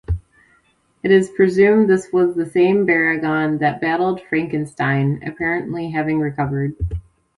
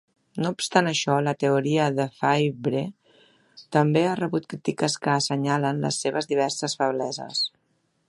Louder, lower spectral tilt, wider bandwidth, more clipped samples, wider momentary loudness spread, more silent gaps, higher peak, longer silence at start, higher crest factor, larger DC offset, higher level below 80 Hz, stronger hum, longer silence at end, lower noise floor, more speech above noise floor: first, -18 LUFS vs -24 LUFS; first, -7.5 dB/octave vs -4.5 dB/octave; about the same, 11.5 kHz vs 11.5 kHz; neither; first, 10 LU vs 7 LU; neither; about the same, -2 dBFS vs -4 dBFS; second, 0.1 s vs 0.35 s; about the same, 16 dB vs 20 dB; neither; first, -38 dBFS vs -68 dBFS; neither; second, 0.4 s vs 0.6 s; second, -59 dBFS vs -70 dBFS; second, 42 dB vs 46 dB